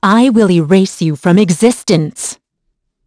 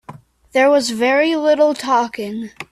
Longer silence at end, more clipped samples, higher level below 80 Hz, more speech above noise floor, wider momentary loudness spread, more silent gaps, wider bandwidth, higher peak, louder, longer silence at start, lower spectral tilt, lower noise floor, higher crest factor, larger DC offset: first, 0.75 s vs 0.1 s; neither; first, -52 dBFS vs -60 dBFS; first, 57 dB vs 24 dB; about the same, 10 LU vs 12 LU; neither; second, 11 kHz vs 13.5 kHz; about the same, 0 dBFS vs -2 dBFS; first, -11 LUFS vs -16 LUFS; about the same, 0 s vs 0.1 s; first, -6 dB/octave vs -3.5 dB/octave; first, -68 dBFS vs -40 dBFS; about the same, 12 dB vs 16 dB; neither